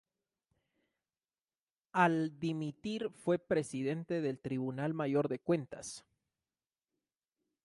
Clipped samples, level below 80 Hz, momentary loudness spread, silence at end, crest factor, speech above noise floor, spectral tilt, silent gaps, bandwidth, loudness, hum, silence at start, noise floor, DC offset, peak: under 0.1%; -74 dBFS; 9 LU; 1.65 s; 22 dB; over 55 dB; -6.5 dB/octave; none; 11.5 kHz; -35 LUFS; none; 1.95 s; under -90 dBFS; under 0.1%; -14 dBFS